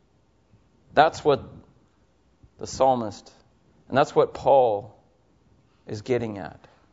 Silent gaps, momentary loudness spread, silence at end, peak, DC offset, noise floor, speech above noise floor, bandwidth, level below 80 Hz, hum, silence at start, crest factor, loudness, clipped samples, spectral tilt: none; 19 LU; 0.45 s; -2 dBFS; under 0.1%; -63 dBFS; 41 dB; 8 kHz; -58 dBFS; none; 0.95 s; 24 dB; -23 LUFS; under 0.1%; -5.5 dB/octave